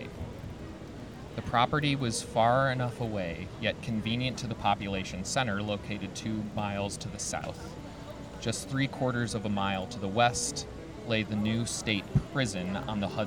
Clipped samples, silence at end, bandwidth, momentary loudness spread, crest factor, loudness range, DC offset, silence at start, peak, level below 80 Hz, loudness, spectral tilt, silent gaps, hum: under 0.1%; 0 s; 16.5 kHz; 15 LU; 20 dB; 4 LU; under 0.1%; 0 s; -10 dBFS; -50 dBFS; -31 LUFS; -4.5 dB/octave; none; none